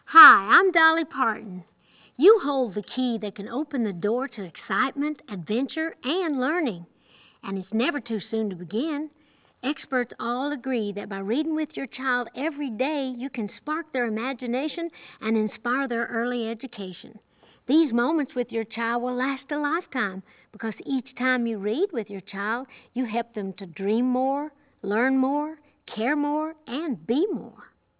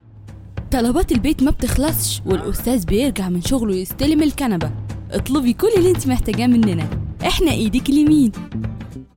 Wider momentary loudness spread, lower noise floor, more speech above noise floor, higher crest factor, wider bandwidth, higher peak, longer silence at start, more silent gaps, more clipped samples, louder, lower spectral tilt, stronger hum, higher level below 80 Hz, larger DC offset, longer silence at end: about the same, 13 LU vs 11 LU; first, -58 dBFS vs -38 dBFS; first, 33 dB vs 21 dB; first, 24 dB vs 14 dB; second, 4 kHz vs 17 kHz; first, 0 dBFS vs -4 dBFS; about the same, 0.1 s vs 0.15 s; neither; neither; second, -25 LUFS vs -18 LUFS; first, -8.5 dB/octave vs -5.5 dB/octave; neither; second, -76 dBFS vs -30 dBFS; neither; first, 0.35 s vs 0.1 s